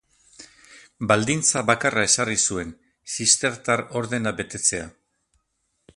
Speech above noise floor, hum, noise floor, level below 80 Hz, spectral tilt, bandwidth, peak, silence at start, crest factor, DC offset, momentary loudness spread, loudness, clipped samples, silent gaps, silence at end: 50 dB; none; -73 dBFS; -54 dBFS; -2.5 dB/octave; 11.5 kHz; -2 dBFS; 0.4 s; 24 dB; under 0.1%; 13 LU; -21 LUFS; under 0.1%; none; 1.05 s